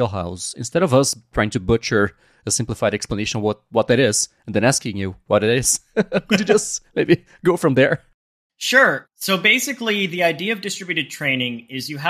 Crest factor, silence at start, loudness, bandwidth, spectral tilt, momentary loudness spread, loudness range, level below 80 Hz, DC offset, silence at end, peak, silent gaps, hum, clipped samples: 18 dB; 0 s; -19 LUFS; 15.5 kHz; -3.5 dB/octave; 9 LU; 2 LU; -46 dBFS; under 0.1%; 0 s; -2 dBFS; 8.14-8.50 s; none; under 0.1%